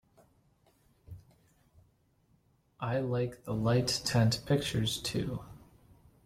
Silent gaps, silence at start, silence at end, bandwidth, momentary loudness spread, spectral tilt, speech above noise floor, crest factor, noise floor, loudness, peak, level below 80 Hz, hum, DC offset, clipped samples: none; 1.1 s; 0.7 s; 15.5 kHz; 25 LU; -5 dB/octave; 39 dB; 18 dB; -70 dBFS; -32 LUFS; -16 dBFS; -58 dBFS; none; under 0.1%; under 0.1%